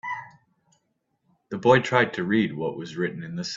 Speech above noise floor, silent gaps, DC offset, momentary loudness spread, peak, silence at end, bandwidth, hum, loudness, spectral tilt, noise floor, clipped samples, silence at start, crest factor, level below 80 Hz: 50 dB; none; under 0.1%; 15 LU; -4 dBFS; 0 s; 7.8 kHz; none; -24 LUFS; -6 dB/octave; -74 dBFS; under 0.1%; 0.05 s; 22 dB; -64 dBFS